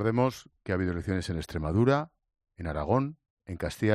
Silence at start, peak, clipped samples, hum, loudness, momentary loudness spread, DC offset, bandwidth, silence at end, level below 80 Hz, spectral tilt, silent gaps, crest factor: 0 s; -10 dBFS; under 0.1%; none; -30 LUFS; 16 LU; under 0.1%; 14 kHz; 0 s; -50 dBFS; -7.5 dB/octave; 3.30-3.37 s; 18 dB